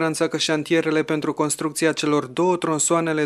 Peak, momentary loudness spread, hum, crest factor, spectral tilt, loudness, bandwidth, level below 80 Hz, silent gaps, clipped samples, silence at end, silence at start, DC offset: -6 dBFS; 3 LU; none; 16 dB; -4 dB/octave; -21 LUFS; 14 kHz; -66 dBFS; none; under 0.1%; 0 s; 0 s; under 0.1%